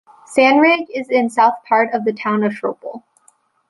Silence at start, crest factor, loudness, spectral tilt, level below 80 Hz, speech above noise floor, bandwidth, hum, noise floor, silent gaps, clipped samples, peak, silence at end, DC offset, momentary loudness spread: 0.3 s; 16 dB; -16 LUFS; -5 dB/octave; -64 dBFS; 41 dB; 11.5 kHz; none; -57 dBFS; none; under 0.1%; -2 dBFS; 0.7 s; under 0.1%; 13 LU